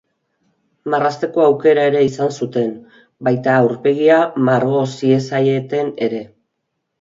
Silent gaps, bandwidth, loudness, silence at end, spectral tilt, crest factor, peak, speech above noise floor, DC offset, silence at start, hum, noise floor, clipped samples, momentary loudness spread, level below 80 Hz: none; 7.6 kHz; -16 LUFS; 0.75 s; -7 dB/octave; 16 dB; 0 dBFS; 58 dB; under 0.1%; 0.85 s; none; -74 dBFS; under 0.1%; 9 LU; -62 dBFS